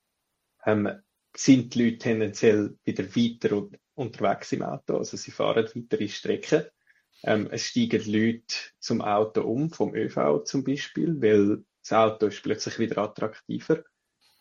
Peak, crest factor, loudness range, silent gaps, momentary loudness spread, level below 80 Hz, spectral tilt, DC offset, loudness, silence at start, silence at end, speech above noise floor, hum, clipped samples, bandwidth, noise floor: -6 dBFS; 20 dB; 4 LU; none; 10 LU; -68 dBFS; -5.5 dB/octave; under 0.1%; -26 LUFS; 0.65 s; 0.6 s; 54 dB; none; under 0.1%; 7.6 kHz; -79 dBFS